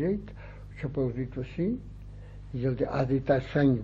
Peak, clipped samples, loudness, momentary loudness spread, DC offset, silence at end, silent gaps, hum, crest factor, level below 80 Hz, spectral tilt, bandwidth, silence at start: -12 dBFS; under 0.1%; -30 LUFS; 20 LU; under 0.1%; 0 s; none; 50 Hz at -45 dBFS; 18 dB; -46 dBFS; -9.5 dB/octave; 7.2 kHz; 0 s